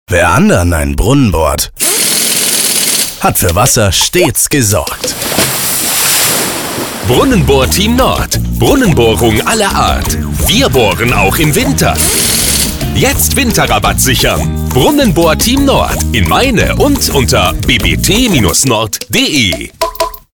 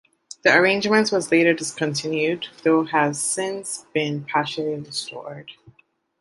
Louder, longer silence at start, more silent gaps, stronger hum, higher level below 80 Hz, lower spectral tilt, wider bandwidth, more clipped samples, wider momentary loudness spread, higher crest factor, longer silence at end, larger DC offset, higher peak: first, -9 LUFS vs -21 LUFS; second, 0.1 s vs 0.45 s; neither; neither; first, -22 dBFS vs -68 dBFS; about the same, -3.5 dB/octave vs -3.5 dB/octave; first, over 20 kHz vs 11.5 kHz; neither; second, 5 LU vs 12 LU; second, 10 dB vs 20 dB; second, 0.15 s vs 0.7 s; neither; about the same, 0 dBFS vs -2 dBFS